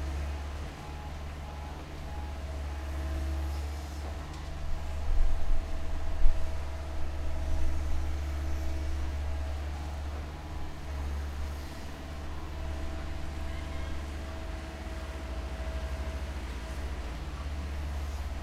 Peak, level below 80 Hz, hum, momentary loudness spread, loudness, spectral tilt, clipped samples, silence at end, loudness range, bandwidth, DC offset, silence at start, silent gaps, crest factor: -8 dBFS; -34 dBFS; none; 7 LU; -38 LUFS; -6 dB/octave; under 0.1%; 0 s; 3 LU; 11 kHz; under 0.1%; 0 s; none; 22 dB